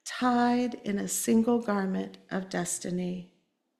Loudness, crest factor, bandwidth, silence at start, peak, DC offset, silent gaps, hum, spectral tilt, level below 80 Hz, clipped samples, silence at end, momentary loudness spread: -29 LUFS; 16 dB; 14.5 kHz; 0.05 s; -14 dBFS; under 0.1%; none; none; -4.5 dB/octave; -66 dBFS; under 0.1%; 0.55 s; 11 LU